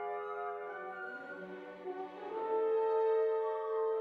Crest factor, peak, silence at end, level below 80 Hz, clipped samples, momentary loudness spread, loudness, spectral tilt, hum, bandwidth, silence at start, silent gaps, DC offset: 12 dB; -24 dBFS; 0 s; -86 dBFS; under 0.1%; 14 LU; -36 LUFS; -6.5 dB/octave; none; 4.7 kHz; 0 s; none; under 0.1%